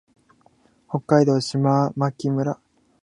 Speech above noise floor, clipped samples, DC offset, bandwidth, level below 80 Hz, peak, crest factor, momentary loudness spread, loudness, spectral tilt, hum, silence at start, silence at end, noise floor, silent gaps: 39 dB; under 0.1%; under 0.1%; 11 kHz; -66 dBFS; -2 dBFS; 20 dB; 13 LU; -21 LUFS; -7 dB/octave; none; 0.9 s; 0.5 s; -59 dBFS; none